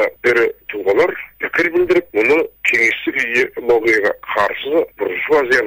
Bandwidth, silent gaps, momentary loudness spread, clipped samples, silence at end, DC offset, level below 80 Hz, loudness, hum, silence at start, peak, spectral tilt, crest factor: 16 kHz; none; 6 LU; under 0.1%; 0 s; under 0.1%; -52 dBFS; -16 LUFS; none; 0 s; -4 dBFS; -4 dB/octave; 12 dB